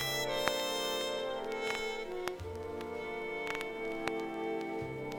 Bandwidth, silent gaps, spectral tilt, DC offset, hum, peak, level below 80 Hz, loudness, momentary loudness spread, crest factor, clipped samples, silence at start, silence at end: 17.5 kHz; none; -3 dB/octave; under 0.1%; none; -10 dBFS; -60 dBFS; -37 LUFS; 8 LU; 28 dB; under 0.1%; 0 s; 0 s